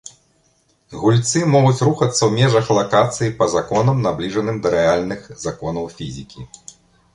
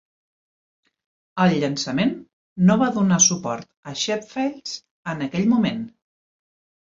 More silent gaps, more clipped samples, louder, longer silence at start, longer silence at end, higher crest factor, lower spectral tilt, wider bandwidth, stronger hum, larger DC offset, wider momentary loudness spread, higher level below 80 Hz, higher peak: second, none vs 2.33-2.56 s, 3.77-3.83 s, 4.91-5.05 s; neither; first, -17 LUFS vs -21 LUFS; second, 0.05 s vs 1.35 s; second, 0.7 s vs 1.05 s; about the same, 16 dB vs 20 dB; first, -5.5 dB/octave vs -4 dB/octave; first, 11.5 kHz vs 7.8 kHz; neither; neither; about the same, 16 LU vs 17 LU; first, -48 dBFS vs -62 dBFS; about the same, -2 dBFS vs -4 dBFS